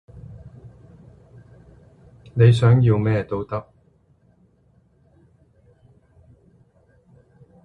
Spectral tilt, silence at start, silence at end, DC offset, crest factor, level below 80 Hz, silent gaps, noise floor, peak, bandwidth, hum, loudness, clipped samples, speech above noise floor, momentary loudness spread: -8.5 dB/octave; 0.15 s; 4.05 s; under 0.1%; 22 dB; -50 dBFS; none; -59 dBFS; -4 dBFS; 9.4 kHz; none; -19 LUFS; under 0.1%; 42 dB; 28 LU